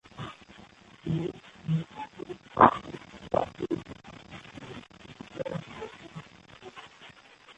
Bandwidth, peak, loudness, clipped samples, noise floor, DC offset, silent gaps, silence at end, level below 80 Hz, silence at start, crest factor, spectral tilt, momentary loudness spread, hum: 8.4 kHz; -4 dBFS; -29 LUFS; under 0.1%; -54 dBFS; under 0.1%; none; 0.05 s; -58 dBFS; 0.15 s; 30 dB; -7 dB/octave; 23 LU; none